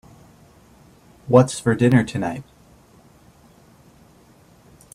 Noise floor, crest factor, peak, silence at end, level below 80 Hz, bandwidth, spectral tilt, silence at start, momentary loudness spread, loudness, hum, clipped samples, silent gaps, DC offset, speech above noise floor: -52 dBFS; 24 dB; 0 dBFS; 2.5 s; -54 dBFS; 13.5 kHz; -7 dB/octave; 1.25 s; 17 LU; -18 LUFS; none; under 0.1%; none; under 0.1%; 35 dB